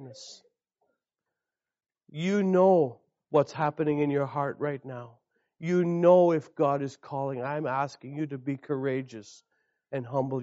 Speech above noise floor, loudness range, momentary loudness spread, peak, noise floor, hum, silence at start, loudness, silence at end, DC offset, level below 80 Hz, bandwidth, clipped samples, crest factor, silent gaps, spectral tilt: over 63 dB; 6 LU; 18 LU; -8 dBFS; under -90 dBFS; none; 0 s; -27 LUFS; 0 s; under 0.1%; -76 dBFS; 8 kHz; under 0.1%; 20 dB; none; -7 dB/octave